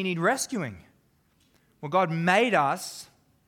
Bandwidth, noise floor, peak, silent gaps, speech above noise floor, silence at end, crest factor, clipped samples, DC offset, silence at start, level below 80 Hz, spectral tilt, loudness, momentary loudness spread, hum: 18.5 kHz; -66 dBFS; -8 dBFS; none; 40 dB; 0.45 s; 20 dB; under 0.1%; under 0.1%; 0 s; -70 dBFS; -4.5 dB/octave; -25 LUFS; 17 LU; none